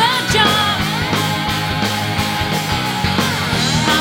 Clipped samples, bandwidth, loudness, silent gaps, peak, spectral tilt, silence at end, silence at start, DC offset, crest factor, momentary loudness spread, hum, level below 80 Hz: under 0.1%; 17 kHz; -16 LUFS; none; 0 dBFS; -3.5 dB/octave; 0 s; 0 s; under 0.1%; 16 dB; 5 LU; none; -36 dBFS